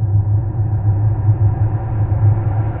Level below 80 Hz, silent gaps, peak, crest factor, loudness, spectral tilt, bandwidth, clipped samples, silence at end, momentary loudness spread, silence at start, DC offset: -28 dBFS; none; -4 dBFS; 10 dB; -17 LUFS; -12 dB/octave; 2.3 kHz; under 0.1%; 0 s; 4 LU; 0 s; under 0.1%